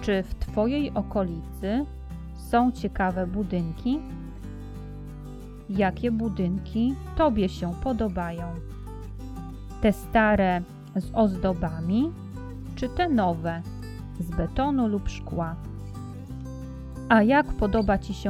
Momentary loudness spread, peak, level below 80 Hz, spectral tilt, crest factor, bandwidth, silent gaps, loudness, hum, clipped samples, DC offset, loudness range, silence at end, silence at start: 17 LU; -6 dBFS; -38 dBFS; -7.5 dB/octave; 20 dB; 14 kHz; none; -26 LUFS; none; under 0.1%; under 0.1%; 4 LU; 0 s; 0 s